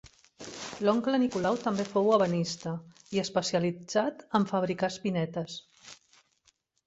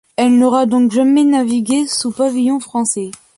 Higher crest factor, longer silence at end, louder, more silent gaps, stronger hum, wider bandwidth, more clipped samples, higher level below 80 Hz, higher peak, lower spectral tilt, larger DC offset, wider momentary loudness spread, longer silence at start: first, 20 dB vs 12 dB; first, 0.9 s vs 0.25 s; second, -29 LUFS vs -14 LUFS; neither; neither; second, 8.2 kHz vs 11.5 kHz; neither; second, -68 dBFS vs -60 dBFS; second, -10 dBFS vs -2 dBFS; first, -5.5 dB/octave vs -4 dB/octave; neither; first, 16 LU vs 6 LU; first, 0.4 s vs 0.2 s